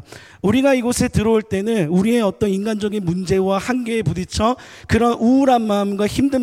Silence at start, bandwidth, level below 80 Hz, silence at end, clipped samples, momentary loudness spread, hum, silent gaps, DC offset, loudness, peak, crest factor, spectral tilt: 0.1 s; 15.5 kHz; -42 dBFS; 0 s; under 0.1%; 6 LU; none; none; under 0.1%; -18 LUFS; -4 dBFS; 14 dB; -6 dB/octave